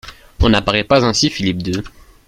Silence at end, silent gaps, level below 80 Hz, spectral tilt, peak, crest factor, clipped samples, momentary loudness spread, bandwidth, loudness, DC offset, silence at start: 0.4 s; none; -28 dBFS; -4.5 dB/octave; 0 dBFS; 16 dB; under 0.1%; 9 LU; 15 kHz; -16 LUFS; under 0.1%; 0.05 s